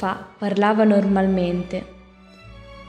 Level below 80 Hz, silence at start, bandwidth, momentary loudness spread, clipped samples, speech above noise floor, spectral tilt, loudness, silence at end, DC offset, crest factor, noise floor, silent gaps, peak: -48 dBFS; 0 s; 8.8 kHz; 12 LU; under 0.1%; 27 dB; -8 dB/octave; -20 LUFS; 0 s; under 0.1%; 16 dB; -46 dBFS; none; -6 dBFS